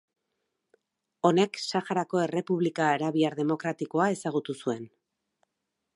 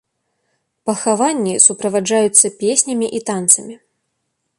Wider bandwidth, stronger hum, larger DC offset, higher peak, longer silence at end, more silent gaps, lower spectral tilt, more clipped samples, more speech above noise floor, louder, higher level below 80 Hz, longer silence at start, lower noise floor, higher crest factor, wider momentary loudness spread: second, 11.5 kHz vs 16 kHz; neither; neither; second, -8 dBFS vs 0 dBFS; first, 1.1 s vs 0.85 s; neither; first, -5.5 dB/octave vs -2.5 dB/octave; neither; about the same, 56 dB vs 56 dB; second, -28 LUFS vs -14 LUFS; second, -80 dBFS vs -64 dBFS; first, 1.25 s vs 0.85 s; first, -83 dBFS vs -72 dBFS; about the same, 22 dB vs 18 dB; about the same, 8 LU vs 9 LU